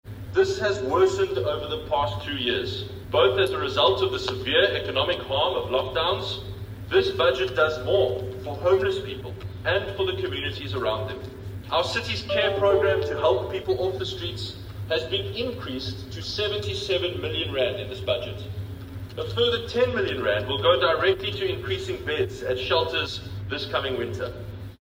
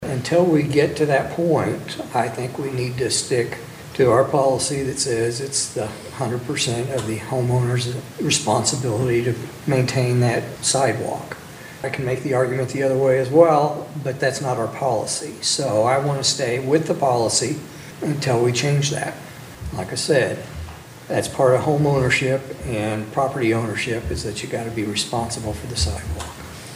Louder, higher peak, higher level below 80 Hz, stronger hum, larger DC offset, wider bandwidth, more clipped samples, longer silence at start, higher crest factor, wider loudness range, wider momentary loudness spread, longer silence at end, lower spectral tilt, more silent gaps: second, -25 LUFS vs -21 LUFS; second, -6 dBFS vs 0 dBFS; about the same, -46 dBFS vs -44 dBFS; neither; neither; about the same, 16 kHz vs 16 kHz; neither; about the same, 0.05 s vs 0 s; about the same, 20 dB vs 20 dB; about the same, 5 LU vs 3 LU; about the same, 13 LU vs 11 LU; about the same, 0.05 s vs 0 s; about the same, -5.5 dB/octave vs -4.5 dB/octave; neither